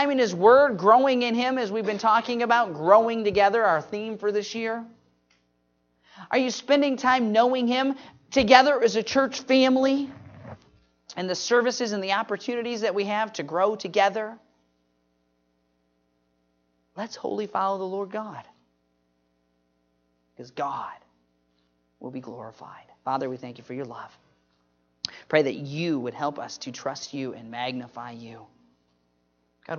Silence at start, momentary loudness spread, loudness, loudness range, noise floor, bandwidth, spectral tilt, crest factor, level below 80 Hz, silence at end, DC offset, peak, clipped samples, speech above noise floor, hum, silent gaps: 0 s; 20 LU; -24 LUFS; 16 LU; -71 dBFS; 7.4 kHz; -4.5 dB/octave; 24 dB; -64 dBFS; 0 s; under 0.1%; -2 dBFS; under 0.1%; 47 dB; none; none